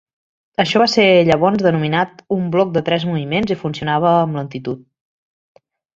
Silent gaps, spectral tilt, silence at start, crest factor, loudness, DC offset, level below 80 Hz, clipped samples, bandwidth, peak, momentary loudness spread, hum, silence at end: none; -6 dB/octave; 0.6 s; 16 dB; -16 LUFS; under 0.1%; -54 dBFS; under 0.1%; 7.6 kHz; 0 dBFS; 13 LU; none; 1.15 s